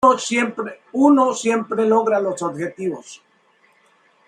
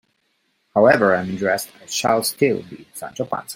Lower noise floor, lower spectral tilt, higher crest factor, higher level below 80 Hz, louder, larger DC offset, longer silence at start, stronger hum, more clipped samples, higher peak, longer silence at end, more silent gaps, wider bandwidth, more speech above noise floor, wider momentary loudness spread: second, -58 dBFS vs -68 dBFS; about the same, -4.5 dB/octave vs -4 dB/octave; about the same, 18 dB vs 18 dB; second, -66 dBFS vs -60 dBFS; about the same, -19 LUFS vs -19 LUFS; neither; second, 0 s vs 0.75 s; neither; neither; about the same, -2 dBFS vs -2 dBFS; first, 1.1 s vs 0 s; neither; second, 11 kHz vs 16.5 kHz; second, 40 dB vs 48 dB; second, 13 LU vs 16 LU